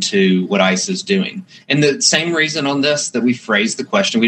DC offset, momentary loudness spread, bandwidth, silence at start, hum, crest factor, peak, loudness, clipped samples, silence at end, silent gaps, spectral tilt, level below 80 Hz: under 0.1%; 6 LU; 9 kHz; 0 s; none; 16 dB; 0 dBFS; -15 LUFS; under 0.1%; 0 s; none; -3.5 dB/octave; -66 dBFS